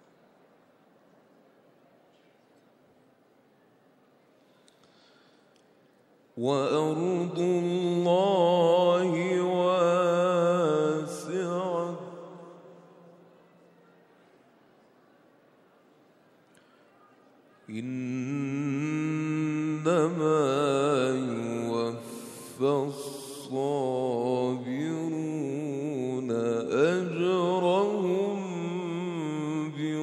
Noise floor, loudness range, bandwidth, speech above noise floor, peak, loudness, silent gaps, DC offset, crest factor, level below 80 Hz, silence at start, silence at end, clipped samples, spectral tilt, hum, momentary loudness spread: -63 dBFS; 12 LU; 14 kHz; 38 dB; -10 dBFS; -28 LUFS; none; under 0.1%; 18 dB; -82 dBFS; 6.35 s; 0 s; under 0.1%; -6.5 dB/octave; none; 11 LU